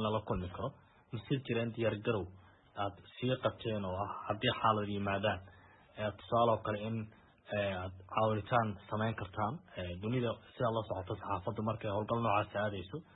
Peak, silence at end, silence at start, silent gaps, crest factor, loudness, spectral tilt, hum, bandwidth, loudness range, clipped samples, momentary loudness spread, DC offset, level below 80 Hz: -16 dBFS; 0.15 s; 0 s; none; 20 dB; -36 LUFS; -4 dB/octave; none; 3.9 kHz; 3 LU; under 0.1%; 11 LU; under 0.1%; -62 dBFS